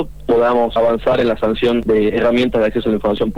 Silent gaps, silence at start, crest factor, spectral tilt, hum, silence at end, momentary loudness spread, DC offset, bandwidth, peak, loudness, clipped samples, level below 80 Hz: none; 0 s; 8 dB; -7 dB/octave; none; 0 s; 3 LU; 2%; 19.5 kHz; -6 dBFS; -15 LUFS; under 0.1%; -36 dBFS